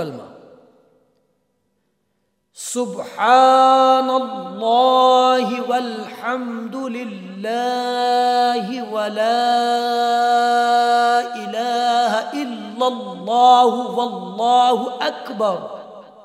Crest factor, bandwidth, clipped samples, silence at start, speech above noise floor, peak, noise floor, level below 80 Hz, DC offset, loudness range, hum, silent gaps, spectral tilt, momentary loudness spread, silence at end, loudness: 18 dB; 15 kHz; under 0.1%; 0 s; 53 dB; 0 dBFS; -70 dBFS; -80 dBFS; under 0.1%; 6 LU; none; none; -3.5 dB/octave; 15 LU; 0.2 s; -17 LUFS